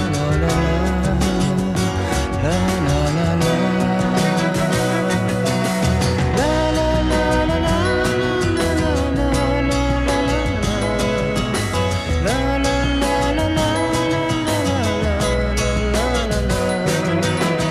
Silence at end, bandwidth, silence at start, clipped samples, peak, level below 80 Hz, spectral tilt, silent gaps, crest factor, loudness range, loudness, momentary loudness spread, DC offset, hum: 0 s; 14.5 kHz; 0 s; under 0.1%; -6 dBFS; -26 dBFS; -5.5 dB/octave; none; 12 dB; 1 LU; -19 LUFS; 2 LU; under 0.1%; none